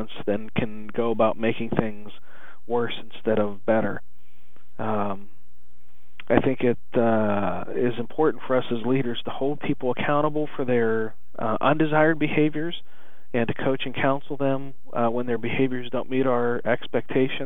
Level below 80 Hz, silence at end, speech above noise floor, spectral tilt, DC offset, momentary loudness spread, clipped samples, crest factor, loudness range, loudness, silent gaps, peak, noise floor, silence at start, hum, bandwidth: -60 dBFS; 0 s; 37 dB; -9 dB/octave; 5%; 9 LU; under 0.1%; 22 dB; 4 LU; -25 LUFS; none; -4 dBFS; -61 dBFS; 0 s; none; 20 kHz